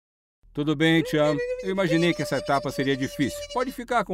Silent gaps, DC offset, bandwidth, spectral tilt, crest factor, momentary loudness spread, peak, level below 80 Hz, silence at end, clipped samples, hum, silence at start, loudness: none; under 0.1%; 16 kHz; -5.5 dB/octave; 16 dB; 8 LU; -10 dBFS; -52 dBFS; 0 s; under 0.1%; none; 0.55 s; -25 LUFS